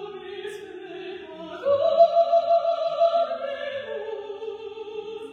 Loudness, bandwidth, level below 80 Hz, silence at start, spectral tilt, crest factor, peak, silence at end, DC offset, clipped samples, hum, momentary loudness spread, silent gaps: -23 LUFS; 6.8 kHz; -72 dBFS; 0 s; -4.5 dB/octave; 18 dB; -6 dBFS; 0 s; under 0.1%; under 0.1%; none; 19 LU; none